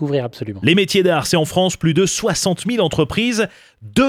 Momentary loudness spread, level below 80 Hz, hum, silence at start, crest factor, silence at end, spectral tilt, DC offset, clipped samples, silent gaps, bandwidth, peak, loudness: 7 LU; -46 dBFS; none; 0 s; 16 dB; 0 s; -4.5 dB/octave; under 0.1%; under 0.1%; none; 16 kHz; -2 dBFS; -17 LUFS